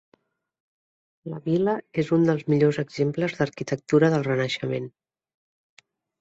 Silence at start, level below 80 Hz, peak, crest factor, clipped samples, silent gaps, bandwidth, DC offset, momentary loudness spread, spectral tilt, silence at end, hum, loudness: 1.25 s; -64 dBFS; -6 dBFS; 18 dB; under 0.1%; none; 8 kHz; under 0.1%; 12 LU; -7 dB/octave; 1.3 s; none; -24 LUFS